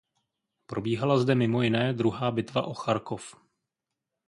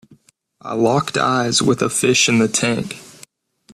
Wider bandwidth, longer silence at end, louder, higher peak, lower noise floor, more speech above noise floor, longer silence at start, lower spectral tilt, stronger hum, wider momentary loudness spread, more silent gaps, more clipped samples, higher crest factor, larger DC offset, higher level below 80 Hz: second, 11 kHz vs 14 kHz; first, 0.95 s vs 0.65 s; second, -27 LUFS vs -16 LUFS; second, -10 dBFS vs -2 dBFS; first, -86 dBFS vs -54 dBFS; first, 60 dB vs 37 dB; about the same, 0.7 s vs 0.65 s; first, -7 dB/octave vs -3.5 dB/octave; neither; about the same, 13 LU vs 15 LU; neither; neither; about the same, 18 dB vs 16 dB; neither; second, -64 dBFS vs -56 dBFS